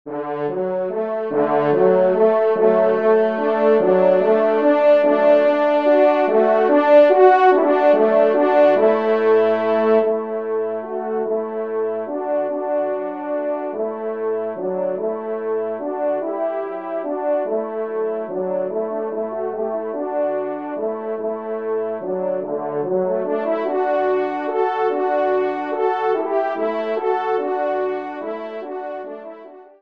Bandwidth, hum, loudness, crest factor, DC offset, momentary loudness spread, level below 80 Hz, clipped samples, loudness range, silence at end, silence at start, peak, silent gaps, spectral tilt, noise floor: 5.4 kHz; none; -19 LUFS; 18 dB; 0.2%; 11 LU; -72 dBFS; under 0.1%; 10 LU; 0.2 s; 0.05 s; 0 dBFS; none; -8 dB/octave; -40 dBFS